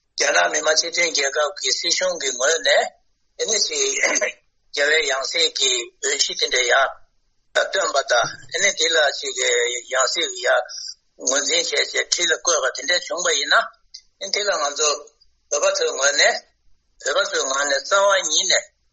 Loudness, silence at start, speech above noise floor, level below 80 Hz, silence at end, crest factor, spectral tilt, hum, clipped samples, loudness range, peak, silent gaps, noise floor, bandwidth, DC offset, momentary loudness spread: -19 LUFS; 0.15 s; 43 dB; -64 dBFS; 0.25 s; 20 dB; 1.5 dB/octave; none; under 0.1%; 2 LU; -2 dBFS; none; -63 dBFS; 8.8 kHz; under 0.1%; 7 LU